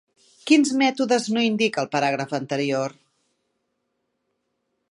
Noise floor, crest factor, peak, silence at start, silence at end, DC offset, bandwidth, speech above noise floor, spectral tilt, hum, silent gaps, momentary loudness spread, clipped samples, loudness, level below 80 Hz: -75 dBFS; 20 dB; -4 dBFS; 0.45 s; 2 s; under 0.1%; 11.5 kHz; 54 dB; -4 dB/octave; none; none; 9 LU; under 0.1%; -22 LUFS; -76 dBFS